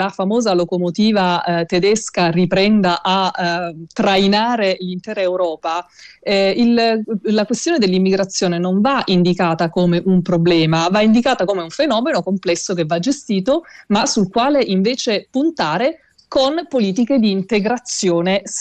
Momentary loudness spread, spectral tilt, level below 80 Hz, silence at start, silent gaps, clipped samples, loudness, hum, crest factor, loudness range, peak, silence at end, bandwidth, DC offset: 6 LU; -5 dB/octave; -52 dBFS; 0 s; none; under 0.1%; -16 LUFS; none; 10 dB; 3 LU; -6 dBFS; 0 s; 9.2 kHz; under 0.1%